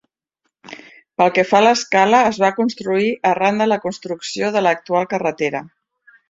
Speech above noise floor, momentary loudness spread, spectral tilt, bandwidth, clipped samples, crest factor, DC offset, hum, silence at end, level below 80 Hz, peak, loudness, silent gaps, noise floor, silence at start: 57 dB; 15 LU; -4.5 dB/octave; 7.8 kHz; under 0.1%; 16 dB; under 0.1%; none; 0.6 s; -62 dBFS; -2 dBFS; -17 LUFS; none; -73 dBFS; 0.7 s